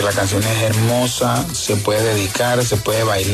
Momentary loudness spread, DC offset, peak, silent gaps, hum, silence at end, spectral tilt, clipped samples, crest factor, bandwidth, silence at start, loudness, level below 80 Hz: 2 LU; under 0.1%; -4 dBFS; none; none; 0 s; -4 dB/octave; under 0.1%; 12 dB; 14 kHz; 0 s; -17 LUFS; -42 dBFS